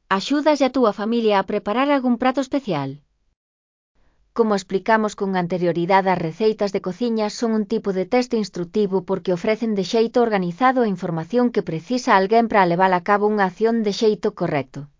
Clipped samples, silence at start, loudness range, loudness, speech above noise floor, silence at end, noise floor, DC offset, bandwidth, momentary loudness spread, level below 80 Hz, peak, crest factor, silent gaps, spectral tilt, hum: under 0.1%; 0.1 s; 5 LU; -20 LUFS; over 70 dB; 0.15 s; under -90 dBFS; under 0.1%; 7.6 kHz; 7 LU; -58 dBFS; -2 dBFS; 18 dB; 3.36-3.95 s; -6 dB/octave; none